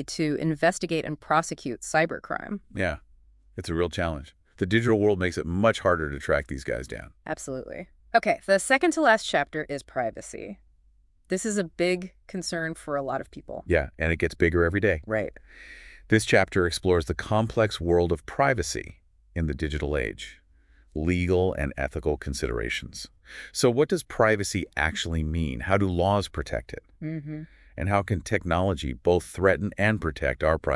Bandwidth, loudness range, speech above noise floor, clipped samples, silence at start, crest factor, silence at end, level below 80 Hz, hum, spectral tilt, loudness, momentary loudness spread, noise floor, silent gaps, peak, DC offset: 12 kHz; 4 LU; 35 dB; under 0.1%; 0 s; 22 dB; 0 s; -44 dBFS; none; -5.5 dB/octave; -26 LUFS; 16 LU; -61 dBFS; none; -4 dBFS; under 0.1%